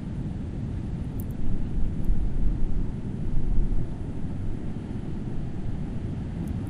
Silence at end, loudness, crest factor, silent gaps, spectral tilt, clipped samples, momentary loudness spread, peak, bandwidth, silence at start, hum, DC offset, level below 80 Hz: 0 s; -32 LUFS; 16 dB; none; -9 dB/octave; under 0.1%; 4 LU; -10 dBFS; 3.7 kHz; 0 s; none; under 0.1%; -28 dBFS